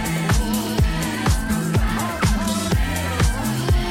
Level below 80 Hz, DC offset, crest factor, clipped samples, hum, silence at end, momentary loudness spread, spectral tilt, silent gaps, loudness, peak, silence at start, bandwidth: -26 dBFS; under 0.1%; 12 dB; under 0.1%; none; 0 s; 1 LU; -5 dB/octave; none; -21 LUFS; -8 dBFS; 0 s; 16.5 kHz